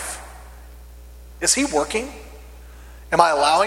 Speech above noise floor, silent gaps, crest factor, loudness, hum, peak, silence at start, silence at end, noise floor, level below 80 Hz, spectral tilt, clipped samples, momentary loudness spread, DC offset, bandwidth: 22 dB; none; 22 dB; -19 LUFS; 60 Hz at -40 dBFS; 0 dBFS; 0 s; 0 s; -41 dBFS; -42 dBFS; -2 dB/octave; under 0.1%; 25 LU; under 0.1%; 17 kHz